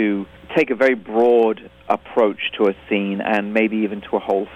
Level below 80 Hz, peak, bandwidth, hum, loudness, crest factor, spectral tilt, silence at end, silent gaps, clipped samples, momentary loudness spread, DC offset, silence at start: -56 dBFS; -4 dBFS; 8.2 kHz; none; -19 LUFS; 14 dB; -7 dB/octave; 0 s; none; under 0.1%; 8 LU; under 0.1%; 0 s